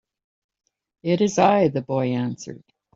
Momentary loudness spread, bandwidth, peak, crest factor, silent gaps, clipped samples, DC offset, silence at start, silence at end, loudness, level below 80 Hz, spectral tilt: 16 LU; 7.8 kHz; -4 dBFS; 20 dB; none; under 0.1%; under 0.1%; 1.05 s; 0.4 s; -21 LUFS; -64 dBFS; -6 dB/octave